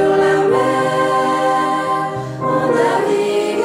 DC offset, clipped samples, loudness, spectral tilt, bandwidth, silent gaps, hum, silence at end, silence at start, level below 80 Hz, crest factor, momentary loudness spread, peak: under 0.1%; under 0.1%; -16 LUFS; -5.5 dB/octave; 15 kHz; none; none; 0 s; 0 s; -56 dBFS; 12 dB; 5 LU; -4 dBFS